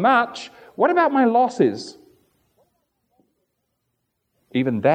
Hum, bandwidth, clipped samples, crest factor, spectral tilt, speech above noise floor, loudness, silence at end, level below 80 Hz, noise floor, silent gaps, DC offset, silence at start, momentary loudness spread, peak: none; 9.4 kHz; under 0.1%; 18 dB; -6 dB/octave; 56 dB; -19 LUFS; 0 s; -74 dBFS; -75 dBFS; none; under 0.1%; 0 s; 18 LU; -4 dBFS